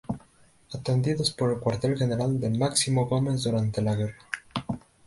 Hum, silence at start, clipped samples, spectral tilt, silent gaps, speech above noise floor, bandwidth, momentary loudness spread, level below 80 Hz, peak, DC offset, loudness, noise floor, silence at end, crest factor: none; 0.1 s; under 0.1%; -5.5 dB/octave; none; 33 dB; 11.5 kHz; 12 LU; -54 dBFS; -10 dBFS; under 0.1%; -27 LUFS; -58 dBFS; 0.3 s; 18 dB